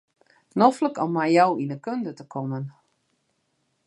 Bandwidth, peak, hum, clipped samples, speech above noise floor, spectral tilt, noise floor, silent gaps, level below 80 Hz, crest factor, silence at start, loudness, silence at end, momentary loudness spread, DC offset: 11.5 kHz; -4 dBFS; none; under 0.1%; 49 dB; -7 dB/octave; -72 dBFS; none; -78 dBFS; 22 dB; 0.55 s; -24 LUFS; 1.15 s; 14 LU; under 0.1%